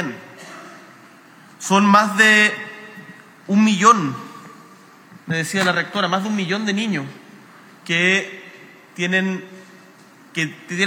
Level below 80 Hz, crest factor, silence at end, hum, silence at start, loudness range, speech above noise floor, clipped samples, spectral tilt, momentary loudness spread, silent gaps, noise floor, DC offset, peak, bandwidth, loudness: -80 dBFS; 20 dB; 0 s; none; 0 s; 6 LU; 29 dB; under 0.1%; -4 dB/octave; 25 LU; none; -47 dBFS; under 0.1%; 0 dBFS; 16.5 kHz; -17 LUFS